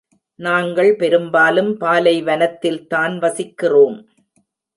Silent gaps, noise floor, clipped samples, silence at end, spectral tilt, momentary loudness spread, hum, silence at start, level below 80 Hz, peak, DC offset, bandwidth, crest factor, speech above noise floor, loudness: none; -64 dBFS; under 0.1%; 0.8 s; -5 dB/octave; 8 LU; none; 0.4 s; -70 dBFS; -2 dBFS; under 0.1%; 11.5 kHz; 14 dB; 49 dB; -16 LUFS